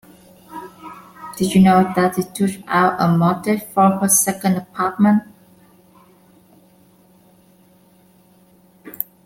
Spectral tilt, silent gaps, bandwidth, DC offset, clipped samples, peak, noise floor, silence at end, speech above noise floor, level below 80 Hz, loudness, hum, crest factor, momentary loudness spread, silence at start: -5 dB/octave; none; 16.5 kHz; under 0.1%; under 0.1%; -2 dBFS; -52 dBFS; 0.2 s; 36 dB; -56 dBFS; -17 LUFS; none; 18 dB; 23 LU; 0.5 s